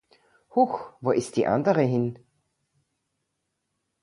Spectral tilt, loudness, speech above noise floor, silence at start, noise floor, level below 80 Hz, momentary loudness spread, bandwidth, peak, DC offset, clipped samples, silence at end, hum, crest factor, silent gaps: -7 dB/octave; -25 LUFS; 55 dB; 0.55 s; -79 dBFS; -64 dBFS; 7 LU; 11.5 kHz; -8 dBFS; under 0.1%; under 0.1%; 1.85 s; none; 20 dB; none